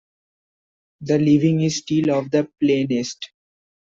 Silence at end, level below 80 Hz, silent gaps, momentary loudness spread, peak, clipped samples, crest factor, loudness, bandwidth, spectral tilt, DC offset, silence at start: 0.6 s; -60 dBFS; none; 16 LU; -6 dBFS; under 0.1%; 16 dB; -20 LUFS; 7.6 kHz; -6 dB/octave; under 0.1%; 1 s